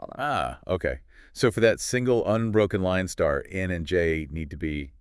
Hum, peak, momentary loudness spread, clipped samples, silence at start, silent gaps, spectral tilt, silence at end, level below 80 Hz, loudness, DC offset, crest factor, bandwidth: none; -6 dBFS; 9 LU; under 0.1%; 0 s; none; -5.5 dB/octave; 0.1 s; -44 dBFS; -26 LUFS; under 0.1%; 20 dB; 12 kHz